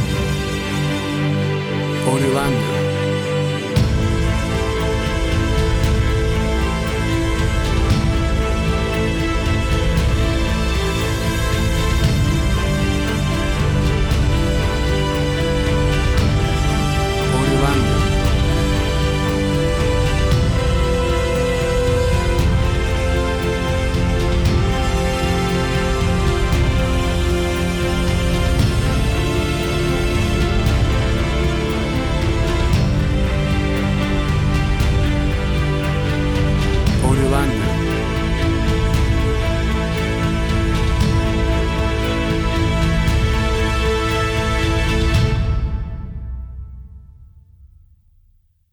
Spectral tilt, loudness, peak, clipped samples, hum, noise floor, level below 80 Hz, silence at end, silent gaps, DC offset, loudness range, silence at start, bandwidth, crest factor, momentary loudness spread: -6 dB/octave; -18 LUFS; -4 dBFS; under 0.1%; none; -56 dBFS; -22 dBFS; 1.05 s; none; 0.1%; 1 LU; 0 s; 19 kHz; 14 dB; 3 LU